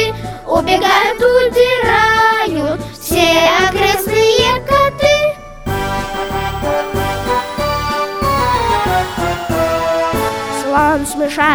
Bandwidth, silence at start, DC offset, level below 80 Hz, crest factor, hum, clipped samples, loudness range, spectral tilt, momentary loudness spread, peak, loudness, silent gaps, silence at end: over 20 kHz; 0 s; under 0.1%; -32 dBFS; 14 dB; none; under 0.1%; 5 LU; -4 dB/octave; 8 LU; 0 dBFS; -14 LUFS; none; 0 s